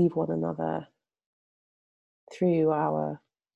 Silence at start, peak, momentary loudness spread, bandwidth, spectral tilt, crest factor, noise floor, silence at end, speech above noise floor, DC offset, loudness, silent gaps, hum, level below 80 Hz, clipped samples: 0 s; -14 dBFS; 11 LU; 8 kHz; -9.5 dB/octave; 16 dB; under -90 dBFS; 0.4 s; over 63 dB; under 0.1%; -28 LUFS; 1.26-2.27 s; none; -68 dBFS; under 0.1%